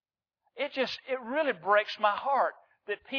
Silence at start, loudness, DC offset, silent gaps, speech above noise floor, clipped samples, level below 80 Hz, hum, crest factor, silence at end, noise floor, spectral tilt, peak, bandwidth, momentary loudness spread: 0.55 s; -30 LUFS; under 0.1%; none; 50 dB; under 0.1%; -80 dBFS; none; 20 dB; 0 s; -79 dBFS; -4 dB/octave; -12 dBFS; 5.4 kHz; 12 LU